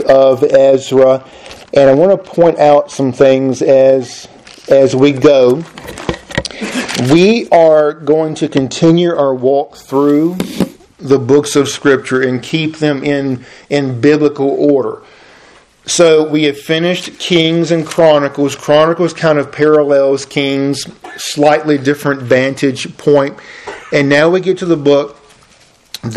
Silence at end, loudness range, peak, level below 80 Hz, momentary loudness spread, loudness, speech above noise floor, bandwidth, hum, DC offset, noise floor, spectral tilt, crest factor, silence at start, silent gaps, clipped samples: 0 s; 3 LU; 0 dBFS; -48 dBFS; 12 LU; -11 LUFS; 36 dB; 13.5 kHz; none; under 0.1%; -47 dBFS; -5.5 dB/octave; 12 dB; 0 s; none; 0.5%